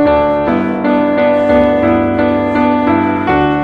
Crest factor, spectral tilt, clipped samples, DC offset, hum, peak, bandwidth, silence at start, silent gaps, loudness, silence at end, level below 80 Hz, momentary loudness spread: 12 dB; -8.5 dB/octave; under 0.1%; under 0.1%; none; 0 dBFS; 5.8 kHz; 0 s; none; -12 LUFS; 0 s; -34 dBFS; 3 LU